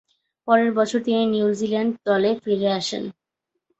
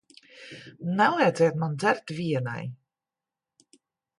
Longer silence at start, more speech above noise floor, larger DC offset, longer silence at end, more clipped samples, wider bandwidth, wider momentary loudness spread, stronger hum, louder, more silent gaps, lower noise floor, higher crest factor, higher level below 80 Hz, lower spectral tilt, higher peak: about the same, 0.45 s vs 0.35 s; second, 60 dB vs 64 dB; neither; second, 0.7 s vs 1.45 s; neither; second, 8.2 kHz vs 11.5 kHz; second, 9 LU vs 22 LU; neither; first, -21 LUFS vs -26 LUFS; neither; second, -80 dBFS vs -90 dBFS; about the same, 18 dB vs 20 dB; first, -66 dBFS vs -72 dBFS; about the same, -5 dB/octave vs -6 dB/octave; first, -4 dBFS vs -8 dBFS